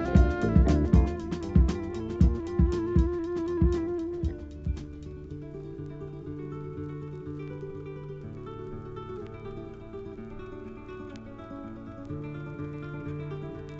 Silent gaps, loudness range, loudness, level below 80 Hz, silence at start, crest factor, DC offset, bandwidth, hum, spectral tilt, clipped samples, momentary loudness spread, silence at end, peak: none; 15 LU; -30 LUFS; -32 dBFS; 0 s; 22 dB; under 0.1%; 7.6 kHz; none; -9 dB/octave; under 0.1%; 18 LU; 0 s; -8 dBFS